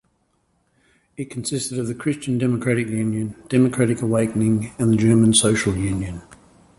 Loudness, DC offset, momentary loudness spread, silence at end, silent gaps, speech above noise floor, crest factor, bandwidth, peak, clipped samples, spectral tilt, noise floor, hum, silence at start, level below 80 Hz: -20 LUFS; under 0.1%; 12 LU; 0.45 s; none; 47 dB; 18 dB; 11.5 kHz; -2 dBFS; under 0.1%; -5 dB/octave; -66 dBFS; none; 1.2 s; -46 dBFS